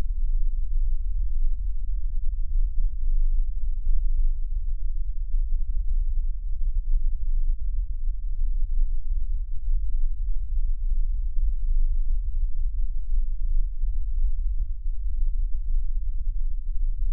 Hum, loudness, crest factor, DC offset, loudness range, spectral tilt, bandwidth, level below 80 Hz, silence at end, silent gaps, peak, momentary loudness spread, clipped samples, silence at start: none; -32 LUFS; 10 dB; under 0.1%; 1 LU; -12.5 dB/octave; 0.2 kHz; -22 dBFS; 0 s; none; -10 dBFS; 3 LU; under 0.1%; 0 s